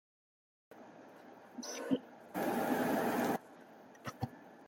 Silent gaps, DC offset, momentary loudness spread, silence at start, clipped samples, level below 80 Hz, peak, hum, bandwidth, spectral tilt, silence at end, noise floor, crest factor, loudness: none; under 0.1%; 23 LU; 0.7 s; under 0.1%; -78 dBFS; -20 dBFS; none; 17 kHz; -5 dB/octave; 0 s; -57 dBFS; 20 dB; -38 LUFS